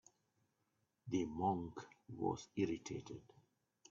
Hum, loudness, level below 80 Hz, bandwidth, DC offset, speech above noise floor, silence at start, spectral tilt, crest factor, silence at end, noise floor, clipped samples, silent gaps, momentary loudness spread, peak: none; -43 LUFS; -74 dBFS; 7.4 kHz; under 0.1%; 42 dB; 1.05 s; -6.5 dB/octave; 20 dB; 0.7 s; -84 dBFS; under 0.1%; none; 16 LU; -24 dBFS